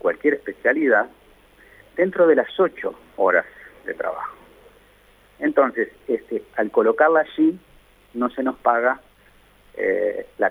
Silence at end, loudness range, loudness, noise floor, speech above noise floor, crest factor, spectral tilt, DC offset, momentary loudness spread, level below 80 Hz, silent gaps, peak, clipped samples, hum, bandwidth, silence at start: 0 s; 4 LU; -21 LUFS; -54 dBFS; 33 dB; 20 dB; -7 dB/octave; under 0.1%; 15 LU; -60 dBFS; none; -2 dBFS; under 0.1%; 50 Hz at -60 dBFS; 13.5 kHz; 0.05 s